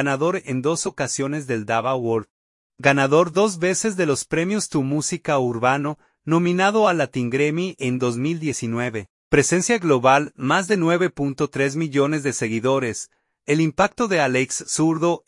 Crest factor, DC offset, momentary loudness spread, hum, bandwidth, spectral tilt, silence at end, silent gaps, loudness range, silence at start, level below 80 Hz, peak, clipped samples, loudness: 20 dB; under 0.1%; 7 LU; none; 11.5 kHz; -5 dB/octave; 0.1 s; 2.30-2.70 s, 9.10-9.31 s; 2 LU; 0 s; -54 dBFS; -2 dBFS; under 0.1%; -21 LUFS